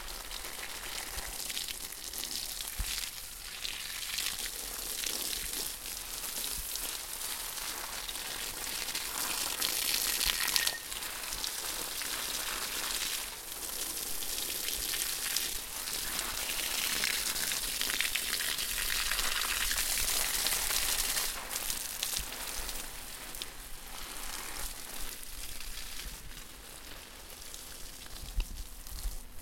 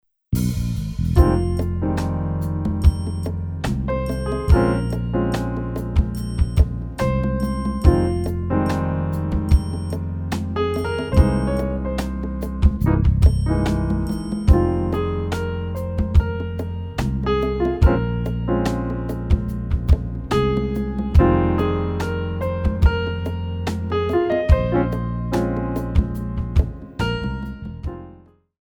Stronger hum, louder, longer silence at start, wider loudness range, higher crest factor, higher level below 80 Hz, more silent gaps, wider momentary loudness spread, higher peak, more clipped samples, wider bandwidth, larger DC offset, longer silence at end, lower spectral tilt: neither; second, -33 LUFS vs -21 LUFS; second, 0 s vs 0.3 s; first, 11 LU vs 2 LU; first, 34 dB vs 20 dB; second, -48 dBFS vs -24 dBFS; neither; first, 13 LU vs 9 LU; about the same, -2 dBFS vs 0 dBFS; neither; about the same, 17 kHz vs 17.5 kHz; neither; second, 0 s vs 0.5 s; second, 0.5 dB/octave vs -8 dB/octave